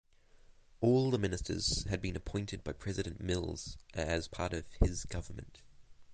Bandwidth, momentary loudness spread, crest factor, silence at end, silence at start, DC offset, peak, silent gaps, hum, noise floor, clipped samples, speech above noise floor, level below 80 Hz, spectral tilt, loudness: 9.6 kHz; 13 LU; 24 dB; 0 s; 0.5 s; under 0.1%; -12 dBFS; none; none; -61 dBFS; under 0.1%; 26 dB; -44 dBFS; -5 dB/octave; -36 LUFS